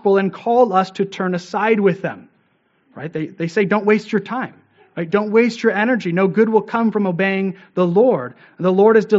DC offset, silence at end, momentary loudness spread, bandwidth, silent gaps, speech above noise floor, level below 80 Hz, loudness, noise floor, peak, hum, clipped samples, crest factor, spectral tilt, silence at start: under 0.1%; 0 s; 12 LU; 7.8 kHz; none; 45 dB; -68 dBFS; -17 LUFS; -61 dBFS; -2 dBFS; none; under 0.1%; 16 dB; -5.5 dB/octave; 0.05 s